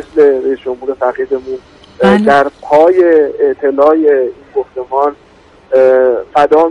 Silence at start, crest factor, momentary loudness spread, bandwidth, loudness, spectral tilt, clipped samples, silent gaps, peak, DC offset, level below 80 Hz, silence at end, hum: 0 s; 10 dB; 11 LU; 10 kHz; -11 LUFS; -7 dB/octave; under 0.1%; none; 0 dBFS; under 0.1%; -48 dBFS; 0 s; none